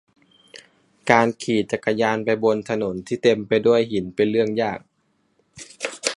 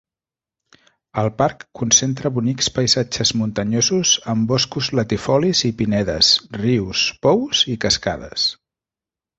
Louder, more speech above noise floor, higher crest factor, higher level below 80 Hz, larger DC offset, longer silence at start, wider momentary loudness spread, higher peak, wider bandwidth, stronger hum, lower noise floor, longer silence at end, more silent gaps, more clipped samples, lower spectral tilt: second, -21 LUFS vs -18 LUFS; second, 47 dB vs 71 dB; about the same, 22 dB vs 18 dB; second, -60 dBFS vs -46 dBFS; neither; second, 0.55 s vs 1.15 s; first, 13 LU vs 7 LU; about the same, 0 dBFS vs -2 dBFS; first, 11.5 kHz vs 8.2 kHz; neither; second, -67 dBFS vs -90 dBFS; second, 0.05 s vs 0.85 s; neither; neither; first, -5 dB/octave vs -3.5 dB/octave